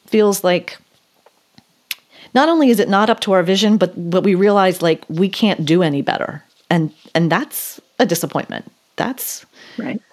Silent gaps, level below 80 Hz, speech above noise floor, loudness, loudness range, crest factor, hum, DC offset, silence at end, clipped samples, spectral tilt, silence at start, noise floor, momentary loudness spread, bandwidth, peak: none; -72 dBFS; 40 dB; -16 LUFS; 6 LU; 18 dB; none; under 0.1%; 0.15 s; under 0.1%; -5 dB/octave; 0.1 s; -56 dBFS; 16 LU; 15.5 kHz; 0 dBFS